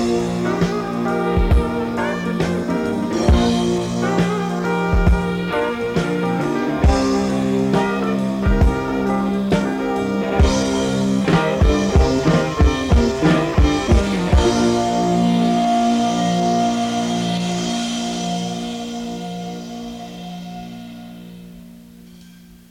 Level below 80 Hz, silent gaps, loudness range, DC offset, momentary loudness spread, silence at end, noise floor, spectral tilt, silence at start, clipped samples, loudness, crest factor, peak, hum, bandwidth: -24 dBFS; none; 9 LU; under 0.1%; 12 LU; 0.4 s; -43 dBFS; -6 dB/octave; 0 s; under 0.1%; -18 LUFS; 18 dB; 0 dBFS; none; 15 kHz